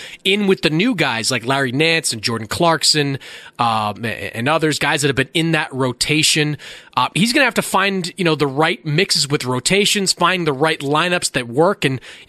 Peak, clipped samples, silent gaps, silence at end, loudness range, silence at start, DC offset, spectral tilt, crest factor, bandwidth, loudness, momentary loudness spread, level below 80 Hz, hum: -2 dBFS; under 0.1%; none; 0.05 s; 2 LU; 0 s; under 0.1%; -3.5 dB/octave; 16 dB; 14 kHz; -17 LUFS; 7 LU; -52 dBFS; none